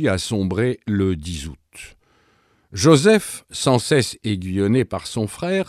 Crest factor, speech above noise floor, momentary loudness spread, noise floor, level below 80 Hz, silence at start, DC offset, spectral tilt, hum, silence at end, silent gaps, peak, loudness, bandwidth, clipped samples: 20 dB; 41 dB; 18 LU; -60 dBFS; -46 dBFS; 0 s; under 0.1%; -5.5 dB/octave; none; 0.05 s; none; 0 dBFS; -20 LUFS; 15 kHz; under 0.1%